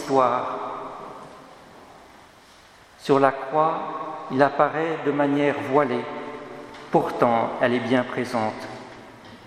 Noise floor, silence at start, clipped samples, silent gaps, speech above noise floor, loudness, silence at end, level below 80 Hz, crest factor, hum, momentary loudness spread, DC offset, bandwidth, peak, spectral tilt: -50 dBFS; 0 s; under 0.1%; none; 29 dB; -23 LUFS; 0 s; -66 dBFS; 22 dB; none; 19 LU; under 0.1%; 14 kHz; -2 dBFS; -6.5 dB/octave